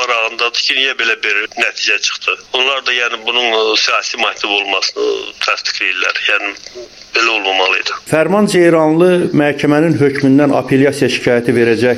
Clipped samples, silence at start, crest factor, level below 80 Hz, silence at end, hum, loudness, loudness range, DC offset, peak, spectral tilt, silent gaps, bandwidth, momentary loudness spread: under 0.1%; 0 s; 14 dB; -54 dBFS; 0 s; none; -12 LUFS; 3 LU; under 0.1%; 0 dBFS; -4 dB/octave; none; 13.5 kHz; 5 LU